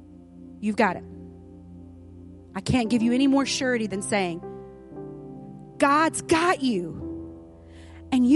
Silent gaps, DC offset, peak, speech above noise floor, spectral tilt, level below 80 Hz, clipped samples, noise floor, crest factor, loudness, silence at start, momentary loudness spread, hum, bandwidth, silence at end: none; under 0.1%; -6 dBFS; 23 dB; -4.5 dB/octave; -52 dBFS; under 0.1%; -46 dBFS; 20 dB; -24 LUFS; 0 s; 25 LU; none; 11.5 kHz; 0 s